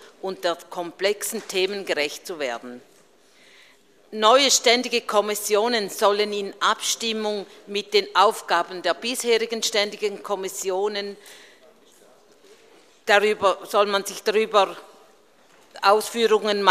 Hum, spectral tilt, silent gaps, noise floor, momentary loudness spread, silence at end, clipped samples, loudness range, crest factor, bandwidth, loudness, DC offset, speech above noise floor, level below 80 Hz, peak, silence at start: none; -1.5 dB/octave; none; -56 dBFS; 12 LU; 0 s; under 0.1%; 7 LU; 24 dB; 15 kHz; -22 LUFS; under 0.1%; 34 dB; -72 dBFS; 0 dBFS; 0 s